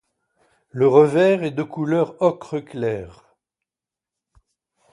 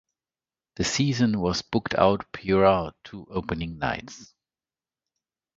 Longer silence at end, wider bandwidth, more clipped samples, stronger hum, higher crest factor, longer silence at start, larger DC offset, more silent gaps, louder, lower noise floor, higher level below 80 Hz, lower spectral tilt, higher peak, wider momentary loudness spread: first, 1.85 s vs 1.35 s; first, 11.5 kHz vs 8 kHz; neither; neither; about the same, 20 dB vs 22 dB; about the same, 0.75 s vs 0.8 s; neither; neither; first, -19 LUFS vs -25 LUFS; about the same, -89 dBFS vs under -90 dBFS; second, -60 dBFS vs -48 dBFS; first, -7.5 dB/octave vs -5 dB/octave; about the same, -2 dBFS vs -4 dBFS; about the same, 15 LU vs 15 LU